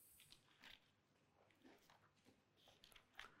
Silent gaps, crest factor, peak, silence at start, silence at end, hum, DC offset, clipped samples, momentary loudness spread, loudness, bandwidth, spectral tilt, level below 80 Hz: none; 34 dB; -36 dBFS; 0 s; 0 s; none; under 0.1%; under 0.1%; 6 LU; -65 LUFS; 16 kHz; -2 dB/octave; -86 dBFS